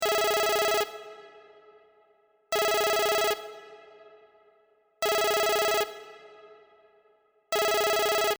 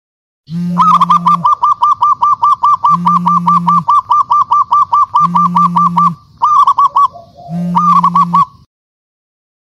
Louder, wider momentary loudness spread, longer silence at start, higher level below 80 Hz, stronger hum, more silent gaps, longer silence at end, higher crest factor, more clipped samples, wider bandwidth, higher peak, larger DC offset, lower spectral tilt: second, -26 LUFS vs -10 LUFS; first, 20 LU vs 6 LU; second, 0 s vs 0.5 s; second, -64 dBFS vs -52 dBFS; neither; neither; second, 0.05 s vs 1.15 s; first, 16 dB vs 10 dB; neither; first, over 20 kHz vs 11 kHz; second, -12 dBFS vs 0 dBFS; neither; second, -0.5 dB/octave vs -6.5 dB/octave